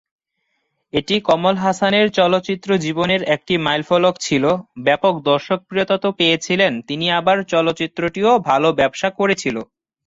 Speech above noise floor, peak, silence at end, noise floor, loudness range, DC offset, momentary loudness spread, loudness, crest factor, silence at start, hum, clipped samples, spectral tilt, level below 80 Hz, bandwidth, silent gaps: 54 dB; -2 dBFS; 0.45 s; -71 dBFS; 1 LU; under 0.1%; 5 LU; -17 LUFS; 16 dB; 0.95 s; none; under 0.1%; -4.5 dB/octave; -56 dBFS; 8 kHz; none